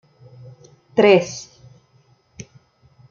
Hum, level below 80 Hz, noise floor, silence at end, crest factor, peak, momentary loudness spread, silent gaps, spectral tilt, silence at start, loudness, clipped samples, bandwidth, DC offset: none; -64 dBFS; -58 dBFS; 1.7 s; 22 dB; -2 dBFS; 27 LU; none; -5 dB/octave; 0.95 s; -17 LUFS; under 0.1%; 7.4 kHz; under 0.1%